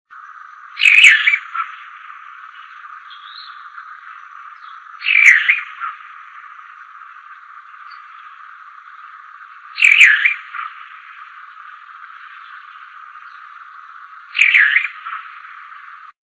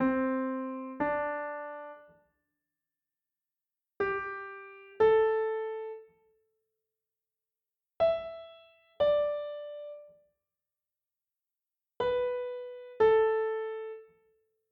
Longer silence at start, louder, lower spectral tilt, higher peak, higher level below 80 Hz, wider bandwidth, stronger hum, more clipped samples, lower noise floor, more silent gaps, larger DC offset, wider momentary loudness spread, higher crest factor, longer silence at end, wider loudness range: first, 0.25 s vs 0 s; first, -10 LUFS vs -31 LUFS; second, 6 dB/octave vs -7.5 dB/octave; first, 0 dBFS vs -14 dBFS; second, -82 dBFS vs -66 dBFS; first, 11 kHz vs 5 kHz; neither; neither; second, -39 dBFS vs under -90 dBFS; neither; neither; first, 29 LU vs 20 LU; about the same, 20 dB vs 20 dB; about the same, 0.65 s vs 0.7 s; first, 22 LU vs 7 LU